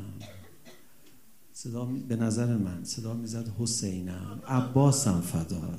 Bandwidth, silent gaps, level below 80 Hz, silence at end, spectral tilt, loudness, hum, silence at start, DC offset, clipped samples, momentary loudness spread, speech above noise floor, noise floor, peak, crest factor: 15.5 kHz; none; -60 dBFS; 0 s; -5.5 dB/octave; -30 LUFS; none; 0 s; 0.3%; under 0.1%; 18 LU; 31 dB; -60 dBFS; -12 dBFS; 18 dB